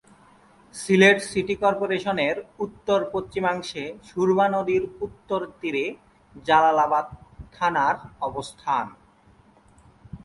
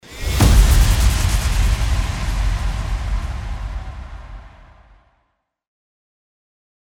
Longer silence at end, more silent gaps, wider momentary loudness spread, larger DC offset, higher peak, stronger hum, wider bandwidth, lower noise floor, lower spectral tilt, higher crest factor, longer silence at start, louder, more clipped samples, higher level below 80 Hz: second, 0.05 s vs 2.5 s; neither; second, 16 LU vs 19 LU; neither; about the same, -2 dBFS vs -2 dBFS; neither; second, 11.5 kHz vs 18 kHz; second, -56 dBFS vs -69 dBFS; about the same, -5 dB/octave vs -4.5 dB/octave; about the same, 22 dB vs 18 dB; first, 0.75 s vs 0.1 s; second, -23 LUFS vs -19 LUFS; neither; second, -56 dBFS vs -20 dBFS